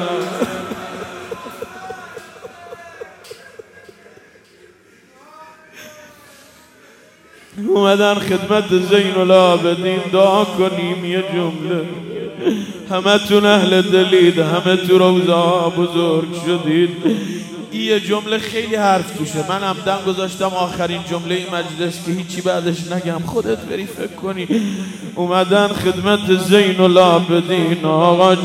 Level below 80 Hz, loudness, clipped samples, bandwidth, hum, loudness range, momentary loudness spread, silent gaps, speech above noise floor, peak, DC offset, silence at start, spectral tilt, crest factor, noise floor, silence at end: -56 dBFS; -16 LUFS; under 0.1%; 16 kHz; none; 9 LU; 18 LU; none; 33 dB; 0 dBFS; under 0.1%; 0 s; -5.5 dB/octave; 16 dB; -49 dBFS; 0 s